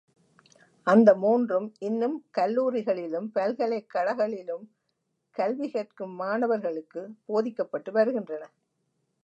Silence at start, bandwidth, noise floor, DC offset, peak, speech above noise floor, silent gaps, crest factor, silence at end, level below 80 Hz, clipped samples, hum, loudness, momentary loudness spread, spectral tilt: 0.85 s; 8 kHz; -78 dBFS; under 0.1%; -6 dBFS; 52 dB; none; 22 dB; 0.8 s; -84 dBFS; under 0.1%; none; -27 LUFS; 16 LU; -7.5 dB/octave